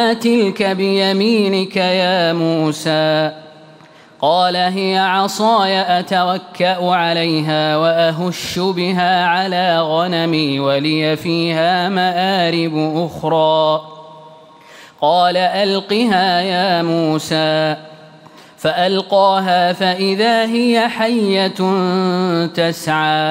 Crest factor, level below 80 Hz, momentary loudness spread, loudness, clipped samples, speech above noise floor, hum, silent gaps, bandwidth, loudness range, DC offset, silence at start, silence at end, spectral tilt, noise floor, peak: 12 dB; -60 dBFS; 4 LU; -15 LUFS; under 0.1%; 28 dB; none; none; 16 kHz; 2 LU; under 0.1%; 0 s; 0 s; -5.5 dB/octave; -43 dBFS; -4 dBFS